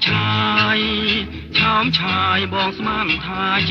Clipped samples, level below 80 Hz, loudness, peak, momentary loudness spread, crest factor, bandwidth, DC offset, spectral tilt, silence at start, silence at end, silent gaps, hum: under 0.1%; -42 dBFS; -17 LUFS; -4 dBFS; 5 LU; 14 dB; 6.8 kHz; under 0.1%; -6 dB/octave; 0 s; 0 s; none; none